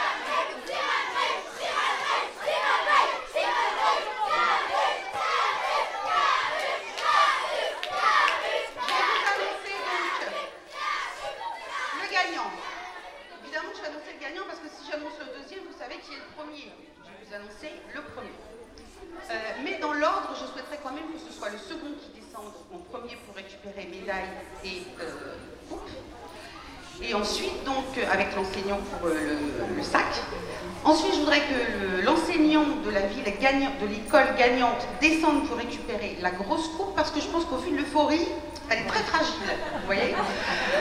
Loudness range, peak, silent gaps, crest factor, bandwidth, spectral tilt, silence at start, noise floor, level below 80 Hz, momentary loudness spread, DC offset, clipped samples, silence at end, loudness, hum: 15 LU; -6 dBFS; none; 22 dB; 16 kHz; -3.5 dB/octave; 0 s; -49 dBFS; -52 dBFS; 19 LU; under 0.1%; under 0.1%; 0 s; -27 LUFS; none